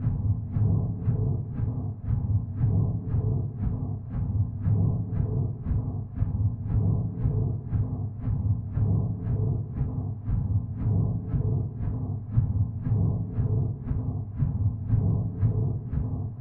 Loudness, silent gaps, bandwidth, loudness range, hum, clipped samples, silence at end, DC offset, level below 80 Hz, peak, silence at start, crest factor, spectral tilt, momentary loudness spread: -28 LUFS; none; 2.1 kHz; 1 LU; none; under 0.1%; 0 s; under 0.1%; -36 dBFS; -10 dBFS; 0 s; 16 dB; -14 dB/octave; 5 LU